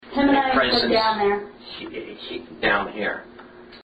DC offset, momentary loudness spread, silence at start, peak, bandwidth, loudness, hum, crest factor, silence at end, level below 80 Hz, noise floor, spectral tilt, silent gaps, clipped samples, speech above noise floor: under 0.1%; 16 LU; 0.05 s; -6 dBFS; 8.4 kHz; -21 LUFS; none; 16 dB; 0.05 s; -50 dBFS; -44 dBFS; -6 dB/octave; none; under 0.1%; 20 dB